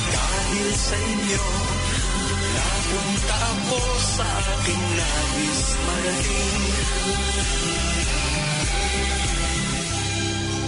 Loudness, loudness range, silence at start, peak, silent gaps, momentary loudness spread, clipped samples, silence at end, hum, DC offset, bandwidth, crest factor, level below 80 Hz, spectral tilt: -22 LUFS; 0 LU; 0 s; -10 dBFS; none; 2 LU; under 0.1%; 0 s; none; under 0.1%; 11 kHz; 12 dB; -28 dBFS; -3 dB/octave